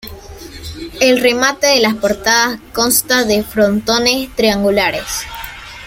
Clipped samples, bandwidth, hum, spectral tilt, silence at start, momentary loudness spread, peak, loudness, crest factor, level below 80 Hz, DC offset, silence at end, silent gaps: under 0.1%; 17 kHz; none; -2.5 dB/octave; 0.05 s; 17 LU; 0 dBFS; -13 LUFS; 16 dB; -40 dBFS; under 0.1%; 0 s; none